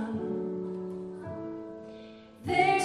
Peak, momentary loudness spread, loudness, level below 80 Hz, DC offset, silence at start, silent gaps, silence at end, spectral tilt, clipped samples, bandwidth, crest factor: -10 dBFS; 19 LU; -33 LUFS; -64 dBFS; under 0.1%; 0 s; none; 0 s; -5 dB/octave; under 0.1%; 12.5 kHz; 20 dB